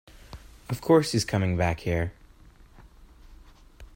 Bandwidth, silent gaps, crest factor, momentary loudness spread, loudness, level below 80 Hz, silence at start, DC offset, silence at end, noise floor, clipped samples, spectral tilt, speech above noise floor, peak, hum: 16.5 kHz; none; 20 dB; 26 LU; -26 LUFS; -48 dBFS; 0.3 s; under 0.1%; 0.1 s; -53 dBFS; under 0.1%; -6 dB/octave; 28 dB; -8 dBFS; none